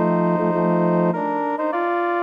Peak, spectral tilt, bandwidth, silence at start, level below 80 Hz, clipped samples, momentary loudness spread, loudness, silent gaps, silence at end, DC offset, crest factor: -8 dBFS; -10 dB/octave; 5 kHz; 0 s; -70 dBFS; under 0.1%; 4 LU; -20 LUFS; none; 0 s; under 0.1%; 12 dB